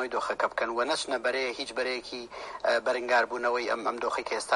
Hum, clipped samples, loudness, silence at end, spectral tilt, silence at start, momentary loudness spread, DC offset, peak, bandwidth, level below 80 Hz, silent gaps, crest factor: none; under 0.1%; -29 LUFS; 0 s; -1.5 dB/octave; 0 s; 6 LU; under 0.1%; -12 dBFS; 11.5 kHz; -66 dBFS; none; 18 dB